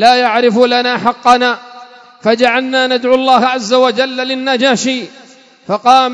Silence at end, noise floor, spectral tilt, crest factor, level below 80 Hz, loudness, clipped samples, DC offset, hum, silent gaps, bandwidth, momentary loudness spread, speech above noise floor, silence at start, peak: 0 s; -36 dBFS; -3.5 dB/octave; 12 dB; -58 dBFS; -12 LUFS; 0.5%; under 0.1%; none; none; 11 kHz; 8 LU; 25 dB; 0 s; 0 dBFS